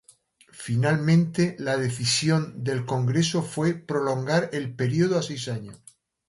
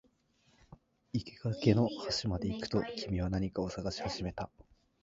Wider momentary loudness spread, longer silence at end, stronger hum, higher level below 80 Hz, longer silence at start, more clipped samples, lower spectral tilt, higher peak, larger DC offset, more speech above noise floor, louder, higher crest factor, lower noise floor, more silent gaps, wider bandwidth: about the same, 9 LU vs 11 LU; about the same, 0.5 s vs 0.4 s; neither; second, -62 dBFS vs -52 dBFS; second, 0.55 s vs 0.7 s; neither; about the same, -5.5 dB/octave vs -6 dB/octave; about the same, -10 dBFS vs -12 dBFS; neither; about the same, 34 dB vs 37 dB; first, -25 LUFS vs -35 LUFS; second, 16 dB vs 24 dB; second, -58 dBFS vs -71 dBFS; neither; first, 11.5 kHz vs 7.8 kHz